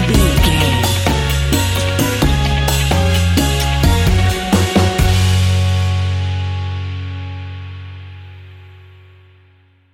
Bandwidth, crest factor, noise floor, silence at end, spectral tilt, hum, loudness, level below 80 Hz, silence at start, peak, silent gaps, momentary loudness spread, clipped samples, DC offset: 17 kHz; 14 dB; -51 dBFS; 1.2 s; -5 dB/octave; none; -15 LUFS; -22 dBFS; 0 s; 0 dBFS; none; 15 LU; under 0.1%; under 0.1%